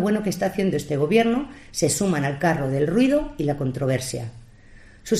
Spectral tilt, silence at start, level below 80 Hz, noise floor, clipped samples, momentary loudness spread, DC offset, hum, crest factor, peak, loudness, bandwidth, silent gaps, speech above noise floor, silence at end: -5.5 dB/octave; 0 s; -46 dBFS; -47 dBFS; under 0.1%; 10 LU; under 0.1%; none; 16 dB; -6 dBFS; -23 LUFS; 15 kHz; none; 25 dB; 0 s